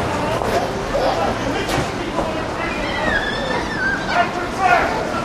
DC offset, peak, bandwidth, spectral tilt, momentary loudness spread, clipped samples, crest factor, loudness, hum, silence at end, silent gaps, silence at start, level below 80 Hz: 0.2%; -2 dBFS; 15 kHz; -4.5 dB/octave; 6 LU; under 0.1%; 18 dB; -20 LUFS; none; 0 s; none; 0 s; -36 dBFS